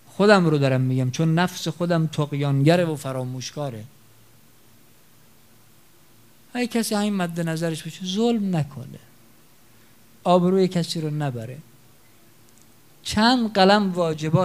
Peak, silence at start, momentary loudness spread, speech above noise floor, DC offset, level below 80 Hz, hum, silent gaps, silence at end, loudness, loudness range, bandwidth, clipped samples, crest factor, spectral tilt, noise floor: -2 dBFS; 0.2 s; 15 LU; 34 dB; 0.2%; -60 dBFS; none; none; 0 s; -22 LUFS; 10 LU; 16 kHz; under 0.1%; 22 dB; -6 dB/octave; -55 dBFS